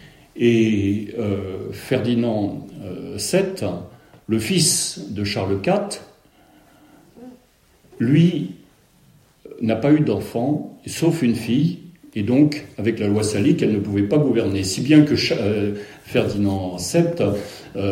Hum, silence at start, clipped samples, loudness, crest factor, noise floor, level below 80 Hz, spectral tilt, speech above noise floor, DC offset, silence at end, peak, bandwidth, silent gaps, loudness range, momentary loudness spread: none; 0.05 s; under 0.1%; -20 LUFS; 20 dB; -56 dBFS; -54 dBFS; -5.5 dB/octave; 36 dB; under 0.1%; 0 s; -2 dBFS; 16 kHz; none; 6 LU; 14 LU